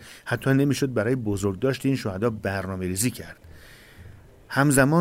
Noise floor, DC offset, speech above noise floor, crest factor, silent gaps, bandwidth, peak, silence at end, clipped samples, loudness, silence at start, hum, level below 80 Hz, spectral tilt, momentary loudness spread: -47 dBFS; under 0.1%; 24 dB; 18 dB; none; 16 kHz; -6 dBFS; 0 s; under 0.1%; -24 LUFS; 0 s; none; -52 dBFS; -5.5 dB/octave; 9 LU